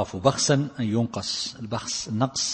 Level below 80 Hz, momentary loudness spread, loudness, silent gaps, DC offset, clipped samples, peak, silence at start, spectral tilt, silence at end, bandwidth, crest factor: -56 dBFS; 7 LU; -25 LUFS; none; under 0.1%; under 0.1%; -4 dBFS; 0 s; -4 dB/octave; 0 s; 8.8 kHz; 22 dB